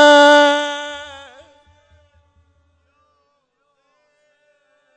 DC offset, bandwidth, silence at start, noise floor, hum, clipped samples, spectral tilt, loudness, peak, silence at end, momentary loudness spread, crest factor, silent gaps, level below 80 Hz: under 0.1%; 9.4 kHz; 0 s; -67 dBFS; none; under 0.1%; -1 dB/octave; -12 LUFS; -2 dBFS; 3.9 s; 27 LU; 16 dB; none; -64 dBFS